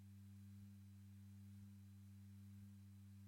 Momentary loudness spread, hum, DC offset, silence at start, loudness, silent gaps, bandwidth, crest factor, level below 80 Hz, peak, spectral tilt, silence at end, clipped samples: 2 LU; none; under 0.1%; 0 s; -62 LUFS; none; 16.5 kHz; 8 dB; -88 dBFS; -52 dBFS; -7 dB/octave; 0 s; under 0.1%